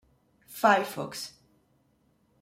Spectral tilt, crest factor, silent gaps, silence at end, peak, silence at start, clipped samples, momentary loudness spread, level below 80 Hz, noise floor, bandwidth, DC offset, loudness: -3.5 dB/octave; 24 dB; none; 1.15 s; -8 dBFS; 0.5 s; under 0.1%; 18 LU; -74 dBFS; -69 dBFS; 16 kHz; under 0.1%; -27 LUFS